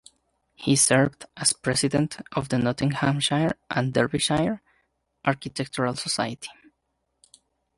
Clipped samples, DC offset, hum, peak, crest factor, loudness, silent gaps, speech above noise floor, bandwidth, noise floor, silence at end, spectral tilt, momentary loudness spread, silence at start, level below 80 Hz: under 0.1%; under 0.1%; none; -4 dBFS; 22 dB; -24 LUFS; none; 52 dB; 11.5 kHz; -76 dBFS; 1.25 s; -4 dB/octave; 11 LU; 0.6 s; -56 dBFS